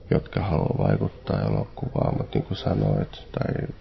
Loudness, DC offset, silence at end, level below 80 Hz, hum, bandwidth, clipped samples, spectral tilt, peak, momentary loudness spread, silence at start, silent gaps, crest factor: -26 LUFS; under 0.1%; 0 s; -40 dBFS; none; 6 kHz; under 0.1%; -10 dB/octave; -6 dBFS; 5 LU; 0 s; none; 20 dB